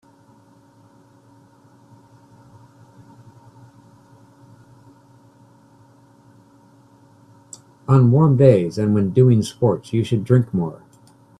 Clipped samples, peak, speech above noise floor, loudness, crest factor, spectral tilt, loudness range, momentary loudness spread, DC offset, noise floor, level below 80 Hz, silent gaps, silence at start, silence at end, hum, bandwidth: under 0.1%; 0 dBFS; 36 dB; -17 LUFS; 22 dB; -8.5 dB/octave; 5 LU; 19 LU; under 0.1%; -52 dBFS; -56 dBFS; none; 7.9 s; 0.65 s; none; 11.5 kHz